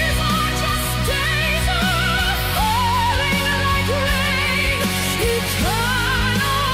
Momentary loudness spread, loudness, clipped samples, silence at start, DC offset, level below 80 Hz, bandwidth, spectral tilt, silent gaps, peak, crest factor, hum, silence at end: 2 LU; -18 LUFS; under 0.1%; 0 s; under 0.1%; -28 dBFS; 16 kHz; -3.5 dB/octave; none; -8 dBFS; 10 dB; none; 0 s